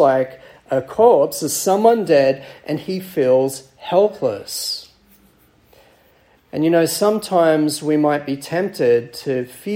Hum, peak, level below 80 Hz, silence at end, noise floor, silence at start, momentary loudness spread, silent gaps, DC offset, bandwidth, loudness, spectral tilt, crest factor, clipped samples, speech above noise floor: none; -2 dBFS; -62 dBFS; 0 s; -54 dBFS; 0 s; 10 LU; none; under 0.1%; 16.5 kHz; -18 LUFS; -4.5 dB/octave; 16 dB; under 0.1%; 37 dB